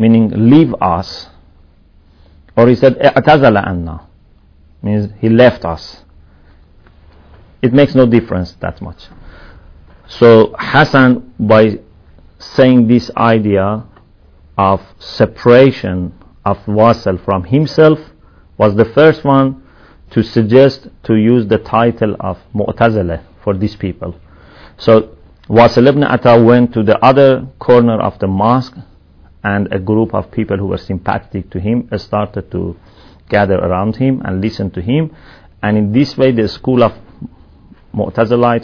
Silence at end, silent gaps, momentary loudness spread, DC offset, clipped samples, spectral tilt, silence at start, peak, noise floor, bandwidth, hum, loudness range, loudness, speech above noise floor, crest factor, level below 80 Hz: 0 s; none; 14 LU; under 0.1%; 1%; -8.5 dB/octave; 0 s; 0 dBFS; -46 dBFS; 5.4 kHz; none; 6 LU; -12 LUFS; 35 dB; 12 dB; -40 dBFS